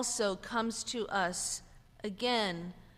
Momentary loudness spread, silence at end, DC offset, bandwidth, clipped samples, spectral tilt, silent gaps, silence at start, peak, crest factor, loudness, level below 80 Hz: 11 LU; 0.1 s; under 0.1%; 15.5 kHz; under 0.1%; -2.5 dB/octave; none; 0 s; -20 dBFS; 16 dB; -34 LUFS; -60 dBFS